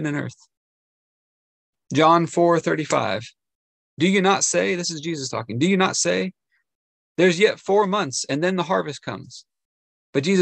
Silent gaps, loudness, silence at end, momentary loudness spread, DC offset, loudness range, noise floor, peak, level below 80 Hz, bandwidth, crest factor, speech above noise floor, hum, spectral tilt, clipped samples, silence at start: 0.57-1.73 s, 3.55-3.97 s, 6.75-7.15 s, 9.65-10.13 s; -21 LUFS; 0 s; 13 LU; under 0.1%; 2 LU; under -90 dBFS; -2 dBFS; -68 dBFS; 9.8 kHz; 20 dB; over 69 dB; none; -4 dB/octave; under 0.1%; 0 s